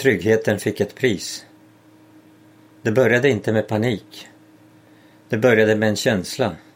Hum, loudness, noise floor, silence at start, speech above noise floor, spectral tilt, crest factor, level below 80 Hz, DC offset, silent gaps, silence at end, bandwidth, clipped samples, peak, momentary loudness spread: none; -19 LUFS; -50 dBFS; 0 s; 31 dB; -5.5 dB/octave; 20 dB; -60 dBFS; under 0.1%; none; 0.15 s; 16.5 kHz; under 0.1%; -2 dBFS; 13 LU